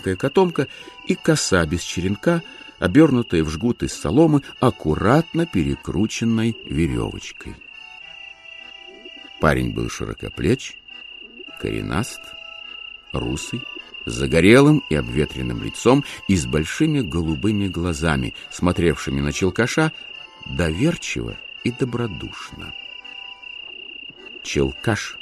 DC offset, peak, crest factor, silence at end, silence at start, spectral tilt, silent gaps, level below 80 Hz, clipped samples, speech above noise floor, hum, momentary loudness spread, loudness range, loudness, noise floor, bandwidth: under 0.1%; 0 dBFS; 20 dB; 0 s; 0 s; -5.5 dB/octave; none; -38 dBFS; under 0.1%; 20 dB; none; 19 LU; 9 LU; -21 LUFS; -40 dBFS; 13 kHz